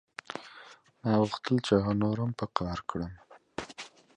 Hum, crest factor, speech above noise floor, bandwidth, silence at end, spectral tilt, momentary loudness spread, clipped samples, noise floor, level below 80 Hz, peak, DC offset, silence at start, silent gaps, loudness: none; 24 dB; 25 dB; 10 kHz; 0.3 s; -7 dB/octave; 17 LU; under 0.1%; -54 dBFS; -54 dBFS; -8 dBFS; under 0.1%; 0.3 s; none; -31 LUFS